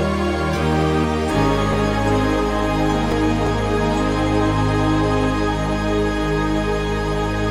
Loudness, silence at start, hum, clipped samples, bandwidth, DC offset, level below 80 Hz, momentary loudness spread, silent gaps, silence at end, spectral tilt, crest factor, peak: -19 LUFS; 0 s; none; under 0.1%; 13.5 kHz; under 0.1%; -28 dBFS; 3 LU; none; 0 s; -6.5 dB/octave; 12 dB; -6 dBFS